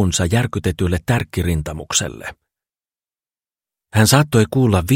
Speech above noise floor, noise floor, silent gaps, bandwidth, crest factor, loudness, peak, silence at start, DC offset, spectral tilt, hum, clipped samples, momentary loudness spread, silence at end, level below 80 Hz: over 73 dB; under -90 dBFS; none; 16.5 kHz; 18 dB; -18 LUFS; 0 dBFS; 0 s; under 0.1%; -5 dB/octave; none; under 0.1%; 10 LU; 0 s; -36 dBFS